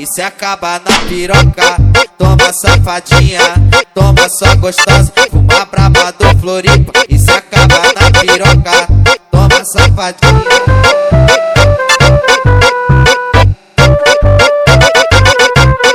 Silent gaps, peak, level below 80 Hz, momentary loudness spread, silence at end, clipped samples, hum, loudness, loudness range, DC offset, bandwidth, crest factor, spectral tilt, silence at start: none; 0 dBFS; -16 dBFS; 3 LU; 0 s; 8%; none; -7 LUFS; 1 LU; under 0.1%; 17 kHz; 6 dB; -4.5 dB/octave; 0 s